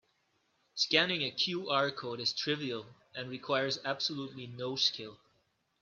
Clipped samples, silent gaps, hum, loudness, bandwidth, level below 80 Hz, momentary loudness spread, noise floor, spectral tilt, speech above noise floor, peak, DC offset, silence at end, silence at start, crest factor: under 0.1%; none; none; -32 LUFS; 7.6 kHz; -78 dBFS; 16 LU; -76 dBFS; -3.5 dB/octave; 41 dB; -10 dBFS; under 0.1%; 0.65 s; 0.75 s; 26 dB